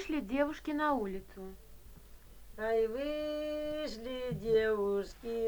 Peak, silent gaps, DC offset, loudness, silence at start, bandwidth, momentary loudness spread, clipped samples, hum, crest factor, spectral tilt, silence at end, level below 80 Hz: -20 dBFS; none; under 0.1%; -35 LUFS; 0 s; over 20 kHz; 13 LU; under 0.1%; none; 16 dB; -6 dB/octave; 0 s; -54 dBFS